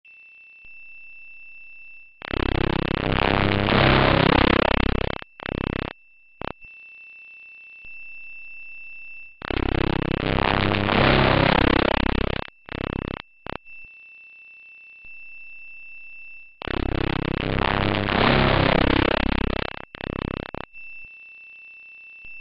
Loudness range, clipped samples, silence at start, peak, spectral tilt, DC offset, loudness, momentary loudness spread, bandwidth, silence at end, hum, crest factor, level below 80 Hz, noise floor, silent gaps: 16 LU; under 0.1%; 0.05 s; -6 dBFS; -9 dB/octave; under 0.1%; -22 LUFS; 24 LU; 5.6 kHz; 0 s; none; 18 dB; -34 dBFS; -48 dBFS; none